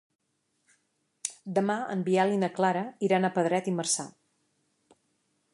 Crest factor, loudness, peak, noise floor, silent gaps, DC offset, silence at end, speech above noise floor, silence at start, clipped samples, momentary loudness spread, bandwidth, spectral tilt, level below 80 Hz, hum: 20 dB; -28 LUFS; -10 dBFS; -75 dBFS; none; under 0.1%; 1.45 s; 48 dB; 1.25 s; under 0.1%; 11 LU; 11.5 kHz; -4.5 dB/octave; -80 dBFS; none